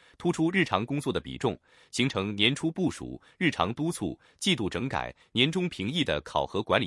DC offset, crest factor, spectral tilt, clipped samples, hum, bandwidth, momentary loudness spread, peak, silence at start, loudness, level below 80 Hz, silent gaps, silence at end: under 0.1%; 22 dB; -5 dB/octave; under 0.1%; none; 12 kHz; 8 LU; -6 dBFS; 0.2 s; -29 LUFS; -56 dBFS; none; 0 s